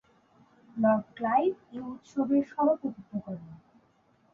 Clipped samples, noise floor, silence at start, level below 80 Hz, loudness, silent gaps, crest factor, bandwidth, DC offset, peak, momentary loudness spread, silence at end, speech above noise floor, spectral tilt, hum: under 0.1%; -66 dBFS; 0.75 s; -70 dBFS; -29 LUFS; none; 16 dB; 7.2 kHz; under 0.1%; -14 dBFS; 14 LU; 0.8 s; 37 dB; -8.5 dB/octave; none